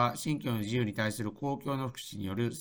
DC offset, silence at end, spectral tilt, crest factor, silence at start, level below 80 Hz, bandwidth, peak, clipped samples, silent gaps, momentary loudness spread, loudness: under 0.1%; 0 s; -5.5 dB/octave; 20 dB; 0 s; -62 dBFS; over 20 kHz; -14 dBFS; under 0.1%; none; 6 LU; -34 LUFS